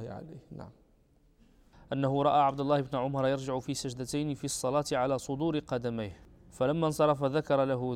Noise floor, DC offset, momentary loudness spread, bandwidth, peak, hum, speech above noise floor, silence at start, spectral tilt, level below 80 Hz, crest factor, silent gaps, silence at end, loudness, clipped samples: -65 dBFS; under 0.1%; 14 LU; 15.5 kHz; -14 dBFS; none; 34 dB; 0 s; -5.5 dB/octave; -60 dBFS; 18 dB; none; 0 s; -30 LUFS; under 0.1%